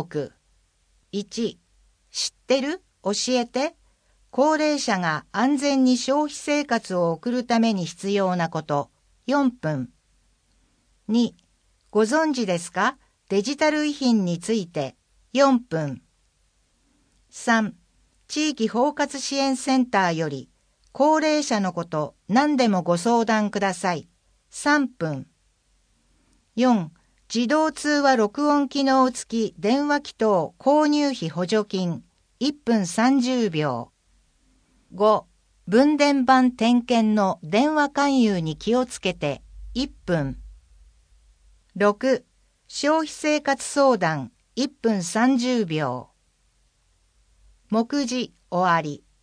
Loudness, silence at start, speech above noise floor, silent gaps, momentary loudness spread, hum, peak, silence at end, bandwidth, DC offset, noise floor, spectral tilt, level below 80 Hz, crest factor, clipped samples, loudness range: -23 LUFS; 0 s; 44 dB; none; 11 LU; none; -4 dBFS; 0.25 s; 10.5 kHz; under 0.1%; -66 dBFS; -4.5 dB/octave; -56 dBFS; 18 dB; under 0.1%; 6 LU